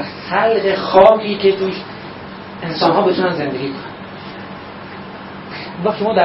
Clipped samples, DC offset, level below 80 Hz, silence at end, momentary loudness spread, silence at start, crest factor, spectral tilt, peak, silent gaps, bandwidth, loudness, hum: under 0.1%; under 0.1%; -50 dBFS; 0 s; 21 LU; 0 s; 16 dB; -8 dB/octave; 0 dBFS; none; 5.8 kHz; -15 LUFS; none